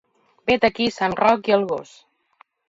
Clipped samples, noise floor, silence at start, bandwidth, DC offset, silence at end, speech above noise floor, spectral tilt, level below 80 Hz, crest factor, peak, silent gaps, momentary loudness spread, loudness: under 0.1%; -58 dBFS; 0.45 s; 8 kHz; under 0.1%; 0.85 s; 38 dB; -5 dB/octave; -56 dBFS; 20 dB; -2 dBFS; none; 10 LU; -20 LUFS